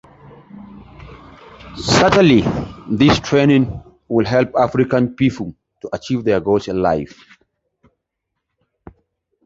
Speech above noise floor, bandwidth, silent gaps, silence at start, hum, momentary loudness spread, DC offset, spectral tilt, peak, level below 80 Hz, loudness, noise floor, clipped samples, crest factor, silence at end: 62 dB; 8 kHz; none; 0.55 s; none; 17 LU; under 0.1%; -6 dB/octave; -2 dBFS; -42 dBFS; -16 LUFS; -77 dBFS; under 0.1%; 16 dB; 2.4 s